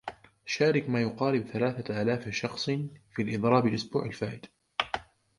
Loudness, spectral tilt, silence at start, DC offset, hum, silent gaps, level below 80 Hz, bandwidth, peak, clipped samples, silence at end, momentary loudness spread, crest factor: -30 LUFS; -6 dB/octave; 0.05 s; under 0.1%; none; none; -62 dBFS; 11.5 kHz; -8 dBFS; under 0.1%; 0.35 s; 12 LU; 20 dB